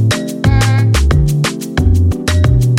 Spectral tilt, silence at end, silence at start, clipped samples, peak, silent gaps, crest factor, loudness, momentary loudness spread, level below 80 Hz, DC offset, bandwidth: -6 dB/octave; 0 s; 0 s; under 0.1%; 0 dBFS; none; 10 dB; -13 LUFS; 4 LU; -18 dBFS; under 0.1%; 16 kHz